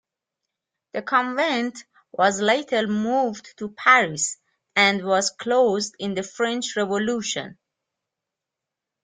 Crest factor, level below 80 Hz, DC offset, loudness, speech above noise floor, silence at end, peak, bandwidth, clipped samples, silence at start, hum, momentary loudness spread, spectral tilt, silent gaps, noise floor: 22 dB; -68 dBFS; under 0.1%; -22 LUFS; 64 dB; 1.5 s; -2 dBFS; 9.8 kHz; under 0.1%; 0.95 s; none; 14 LU; -3 dB/octave; none; -86 dBFS